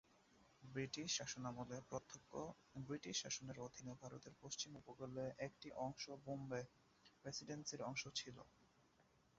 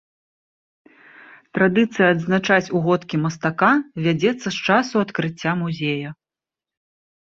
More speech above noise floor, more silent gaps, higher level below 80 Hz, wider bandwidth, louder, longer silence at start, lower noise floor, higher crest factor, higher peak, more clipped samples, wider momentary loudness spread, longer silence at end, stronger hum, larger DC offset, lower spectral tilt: second, 26 dB vs 70 dB; neither; second, -78 dBFS vs -62 dBFS; about the same, 7.6 kHz vs 7.6 kHz; second, -50 LUFS vs -20 LUFS; second, 0.1 s vs 1.55 s; second, -76 dBFS vs -89 dBFS; about the same, 20 dB vs 20 dB; second, -32 dBFS vs -2 dBFS; neither; first, 12 LU vs 7 LU; second, 0.35 s vs 1.1 s; neither; neither; second, -3.5 dB/octave vs -6 dB/octave